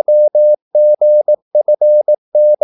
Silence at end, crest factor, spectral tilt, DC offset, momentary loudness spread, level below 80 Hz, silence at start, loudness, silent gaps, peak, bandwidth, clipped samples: 0.1 s; 6 dB; -10.5 dB/octave; under 0.1%; 4 LU; -82 dBFS; 0.1 s; -11 LUFS; 0.62-0.71 s, 1.42-1.51 s, 2.18-2.32 s; -4 dBFS; 0.9 kHz; under 0.1%